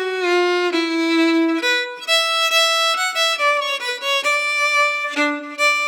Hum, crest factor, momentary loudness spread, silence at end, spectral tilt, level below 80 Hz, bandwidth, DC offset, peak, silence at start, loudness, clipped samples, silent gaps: none; 14 dB; 5 LU; 0 s; 1 dB/octave; -90 dBFS; 19.5 kHz; under 0.1%; -6 dBFS; 0 s; -17 LUFS; under 0.1%; none